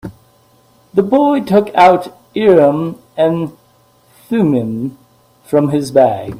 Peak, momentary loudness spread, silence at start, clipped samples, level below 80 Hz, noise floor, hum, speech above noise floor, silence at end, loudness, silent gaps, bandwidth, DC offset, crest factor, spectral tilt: 0 dBFS; 14 LU; 0.05 s; under 0.1%; -52 dBFS; -51 dBFS; none; 39 dB; 0 s; -13 LUFS; none; 15.5 kHz; under 0.1%; 14 dB; -7.5 dB/octave